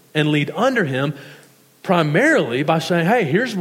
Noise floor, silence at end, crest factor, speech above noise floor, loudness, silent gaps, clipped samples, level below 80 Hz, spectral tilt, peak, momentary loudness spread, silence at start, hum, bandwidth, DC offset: -43 dBFS; 0 s; 16 dB; 26 dB; -18 LUFS; none; under 0.1%; -72 dBFS; -6 dB/octave; -2 dBFS; 8 LU; 0.15 s; none; 16 kHz; under 0.1%